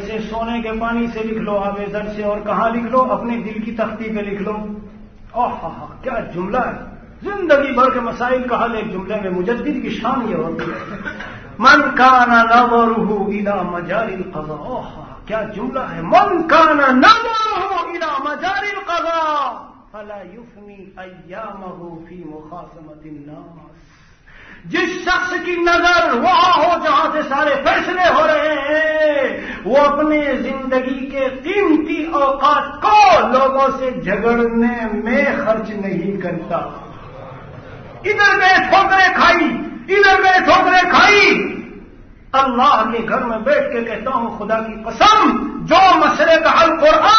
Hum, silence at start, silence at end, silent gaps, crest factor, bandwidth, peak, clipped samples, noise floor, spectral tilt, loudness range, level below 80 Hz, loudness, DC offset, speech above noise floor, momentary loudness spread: none; 0 s; 0 s; none; 16 dB; 6.6 kHz; 0 dBFS; under 0.1%; -45 dBFS; -4.5 dB/octave; 11 LU; -42 dBFS; -15 LUFS; under 0.1%; 30 dB; 20 LU